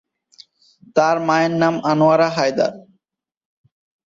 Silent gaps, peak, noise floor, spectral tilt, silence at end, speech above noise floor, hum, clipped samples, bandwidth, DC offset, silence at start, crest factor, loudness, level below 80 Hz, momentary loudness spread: none; -4 dBFS; -85 dBFS; -6 dB/octave; 1.25 s; 69 dB; none; under 0.1%; 7.6 kHz; under 0.1%; 0.95 s; 16 dB; -17 LUFS; -62 dBFS; 7 LU